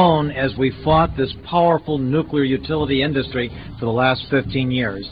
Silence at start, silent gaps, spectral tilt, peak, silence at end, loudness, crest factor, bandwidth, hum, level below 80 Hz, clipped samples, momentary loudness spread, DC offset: 0 s; none; -10 dB/octave; -2 dBFS; 0 s; -19 LUFS; 16 dB; 5.2 kHz; none; -38 dBFS; under 0.1%; 7 LU; 0.2%